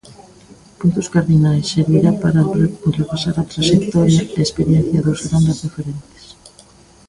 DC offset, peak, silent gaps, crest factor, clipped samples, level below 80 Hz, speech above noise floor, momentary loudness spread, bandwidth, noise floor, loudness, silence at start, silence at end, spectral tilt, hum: under 0.1%; 0 dBFS; none; 16 dB; under 0.1%; -42 dBFS; 31 dB; 6 LU; 11 kHz; -46 dBFS; -16 LUFS; 0.1 s; 1.1 s; -6.5 dB/octave; none